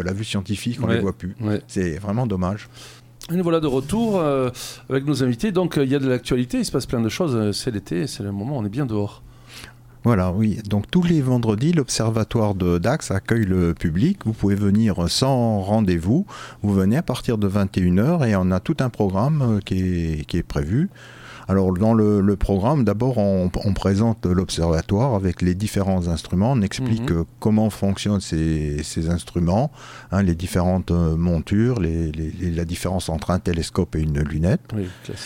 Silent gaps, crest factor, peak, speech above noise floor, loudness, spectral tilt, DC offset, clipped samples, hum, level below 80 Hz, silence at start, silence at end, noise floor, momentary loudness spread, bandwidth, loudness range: none; 16 dB; -4 dBFS; 21 dB; -21 LUFS; -6.5 dB/octave; under 0.1%; under 0.1%; none; -38 dBFS; 0 s; 0 s; -42 dBFS; 7 LU; 16.5 kHz; 4 LU